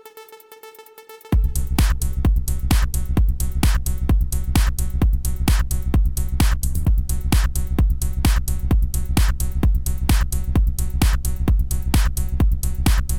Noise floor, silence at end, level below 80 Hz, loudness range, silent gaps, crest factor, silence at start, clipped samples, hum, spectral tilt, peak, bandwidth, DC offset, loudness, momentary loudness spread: -43 dBFS; 0 s; -20 dBFS; 1 LU; none; 14 dB; 0.05 s; under 0.1%; none; -5 dB/octave; -4 dBFS; 18 kHz; under 0.1%; -21 LUFS; 3 LU